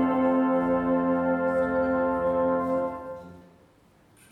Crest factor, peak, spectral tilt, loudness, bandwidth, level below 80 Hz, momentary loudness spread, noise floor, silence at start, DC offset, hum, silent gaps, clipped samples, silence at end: 12 dB; -14 dBFS; -9 dB/octave; -25 LUFS; 4 kHz; -54 dBFS; 9 LU; -59 dBFS; 0 s; under 0.1%; none; none; under 0.1%; 0.9 s